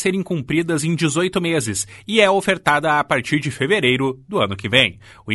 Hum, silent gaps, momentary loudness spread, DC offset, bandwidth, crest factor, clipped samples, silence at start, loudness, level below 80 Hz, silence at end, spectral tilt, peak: none; none; 6 LU; under 0.1%; 12 kHz; 18 dB; under 0.1%; 0 s; -18 LUFS; -52 dBFS; 0 s; -4 dB/octave; 0 dBFS